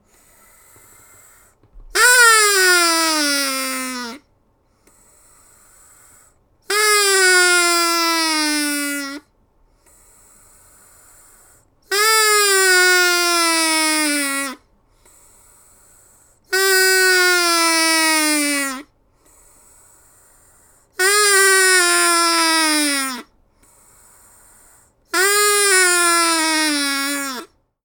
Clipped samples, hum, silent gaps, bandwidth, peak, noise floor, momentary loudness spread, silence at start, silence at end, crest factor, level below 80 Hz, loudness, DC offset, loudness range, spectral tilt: under 0.1%; none; none; 19.5 kHz; 0 dBFS; -60 dBFS; 12 LU; 1.75 s; 0.4 s; 18 dB; -58 dBFS; -14 LUFS; under 0.1%; 7 LU; 1.5 dB/octave